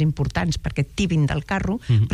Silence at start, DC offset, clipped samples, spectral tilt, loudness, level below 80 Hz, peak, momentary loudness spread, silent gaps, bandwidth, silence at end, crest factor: 0 s; under 0.1%; under 0.1%; -6.5 dB/octave; -23 LUFS; -36 dBFS; -8 dBFS; 4 LU; none; 11 kHz; 0 s; 14 dB